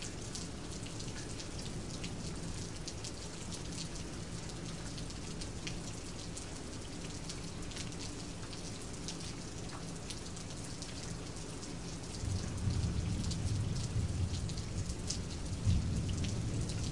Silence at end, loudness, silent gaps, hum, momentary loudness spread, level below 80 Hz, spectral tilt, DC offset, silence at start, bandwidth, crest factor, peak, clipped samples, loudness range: 0 s; -41 LUFS; none; none; 7 LU; -48 dBFS; -4.5 dB/octave; 0.3%; 0 s; 11.5 kHz; 22 dB; -18 dBFS; under 0.1%; 6 LU